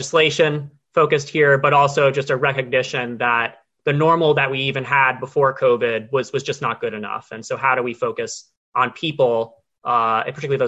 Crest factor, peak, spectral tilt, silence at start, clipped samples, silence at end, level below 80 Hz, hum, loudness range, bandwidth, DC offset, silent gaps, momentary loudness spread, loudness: 16 dB; -4 dBFS; -5 dB/octave; 0 s; under 0.1%; 0 s; -60 dBFS; none; 5 LU; 8.4 kHz; under 0.1%; 8.57-8.72 s; 11 LU; -19 LUFS